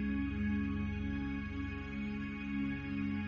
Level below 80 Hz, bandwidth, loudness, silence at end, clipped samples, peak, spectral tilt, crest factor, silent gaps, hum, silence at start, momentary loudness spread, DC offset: -48 dBFS; 6.6 kHz; -38 LUFS; 0 s; under 0.1%; -24 dBFS; -8.5 dB/octave; 12 dB; none; none; 0 s; 5 LU; under 0.1%